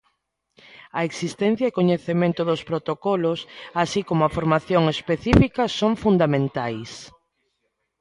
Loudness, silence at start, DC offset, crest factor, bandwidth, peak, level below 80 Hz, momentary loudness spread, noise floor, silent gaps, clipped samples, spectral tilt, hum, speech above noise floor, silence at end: -22 LUFS; 0.95 s; under 0.1%; 22 dB; 11 kHz; 0 dBFS; -42 dBFS; 10 LU; -75 dBFS; none; under 0.1%; -6.5 dB/octave; none; 53 dB; 0.9 s